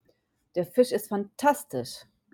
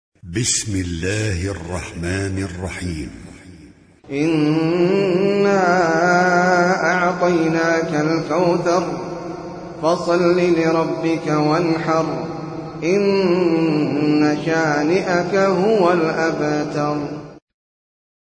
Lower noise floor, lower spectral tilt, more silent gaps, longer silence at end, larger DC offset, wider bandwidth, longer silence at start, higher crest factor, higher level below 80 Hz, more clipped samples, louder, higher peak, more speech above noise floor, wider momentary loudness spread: first, -70 dBFS vs -45 dBFS; about the same, -5 dB/octave vs -5.5 dB/octave; neither; second, 0.3 s vs 0.95 s; neither; first, 17.5 kHz vs 10.5 kHz; first, 0.55 s vs 0.25 s; about the same, 20 dB vs 16 dB; second, -72 dBFS vs -46 dBFS; neither; second, -28 LUFS vs -18 LUFS; second, -10 dBFS vs -4 dBFS; first, 43 dB vs 28 dB; about the same, 12 LU vs 12 LU